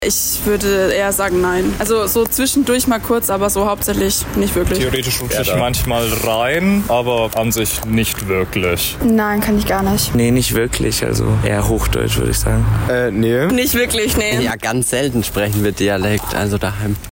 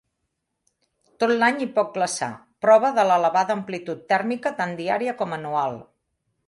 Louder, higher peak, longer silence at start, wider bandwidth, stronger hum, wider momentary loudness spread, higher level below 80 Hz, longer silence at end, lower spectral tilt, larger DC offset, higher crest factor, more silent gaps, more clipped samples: first, -16 LUFS vs -22 LUFS; about the same, -6 dBFS vs -4 dBFS; second, 0 s vs 1.2 s; first, 16.5 kHz vs 11.5 kHz; neither; second, 3 LU vs 11 LU; first, -28 dBFS vs -72 dBFS; second, 0.05 s vs 0.65 s; about the same, -4.5 dB/octave vs -4.5 dB/octave; neither; second, 10 dB vs 20 dB; neither; neither